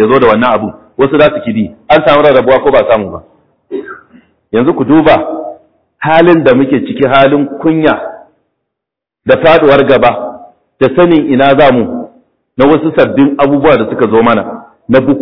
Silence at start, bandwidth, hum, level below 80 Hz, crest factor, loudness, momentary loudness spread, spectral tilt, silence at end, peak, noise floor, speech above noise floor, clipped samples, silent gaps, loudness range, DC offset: 0 s; 5.4 kHz; none; -40 dBFS; 8 dB; -8 LUFS; 17 LU; -9 dB/octave; 0 s; 0 dBFS; -79 dBFS; 72 dB; 0.9%; none; 3 LU; 0.9%